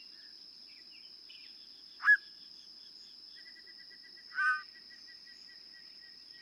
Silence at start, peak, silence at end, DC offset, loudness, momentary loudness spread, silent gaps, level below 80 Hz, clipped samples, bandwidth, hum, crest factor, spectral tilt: 0 s; -16 dBFS; 0 s; under 0.1%; -30 LUFS; 22 LU; none; -86 dBFS; under 0.1%; 12 kHz; none; 22 dB; 1 dB/octave